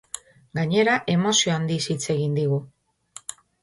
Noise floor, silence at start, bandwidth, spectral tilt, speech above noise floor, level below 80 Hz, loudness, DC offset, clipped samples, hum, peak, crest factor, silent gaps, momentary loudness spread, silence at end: -48 dBFS; 0.15 s; 11.5 kHz; -4 dB/octave; 26 dB; -62 dBFS; -22 LUFS; under 0.1%; under 0.1%; none; -8 dBFS; 16 dB; none; 18 LU; 0.3 s